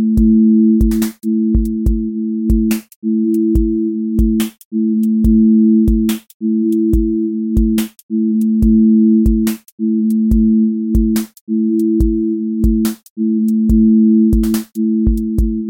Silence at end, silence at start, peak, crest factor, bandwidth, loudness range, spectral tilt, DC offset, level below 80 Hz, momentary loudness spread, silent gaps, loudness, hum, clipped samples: 0 s; 0 s; -2 dBFS; 12 dB; 17 kHz; 2 LU; -8 dB/octave; under 0.1%; -22 dBFS; 9 LU; 2.96-3.02 s, 4.65-4.71 s, 6.34-6.40 s, 8.03-8.09 s, 9.72-9.78 s, 11.41-11.47 s, 13.10-13.16 s; -14 LUFS; none; under 0.1%